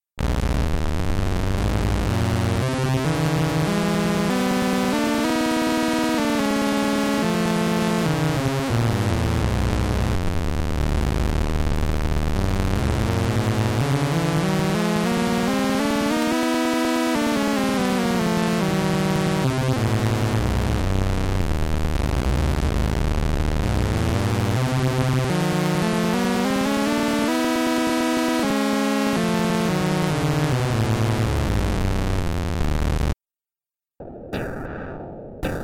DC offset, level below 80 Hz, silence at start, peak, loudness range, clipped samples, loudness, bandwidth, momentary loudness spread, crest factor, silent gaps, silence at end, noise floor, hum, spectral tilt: under 0.1%; -30 dBFS; 0.15 s; -12 dBFS; 2 LU; under 0.1%; -22 LUFS; 17 kHz; 4 LU; 10 dB; none; 0 s; under -90 dBFS; none; -6 dB/octave